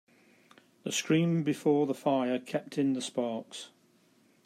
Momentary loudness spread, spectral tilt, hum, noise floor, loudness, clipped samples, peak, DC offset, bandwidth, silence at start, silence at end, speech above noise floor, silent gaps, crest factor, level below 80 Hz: 15 LU; -5.5 dB/octave; none; -66 dBFS; -30 LUFS; under 0.1%; -14 dBFS; under 0.1%; 14 kHz; 0.85 s; 0.8 s; 36 dB; none; 18 dB; -78 dBFS